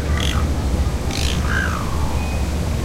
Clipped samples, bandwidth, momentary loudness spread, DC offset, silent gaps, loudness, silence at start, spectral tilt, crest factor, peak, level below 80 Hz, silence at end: under 0.1%; 16 kHz; 3 LU; under 0.1%; none; -21 LUFS; 0 s; -5 dB/octave; 14 dB; -6 dBFS; -22 dBFS; 0 s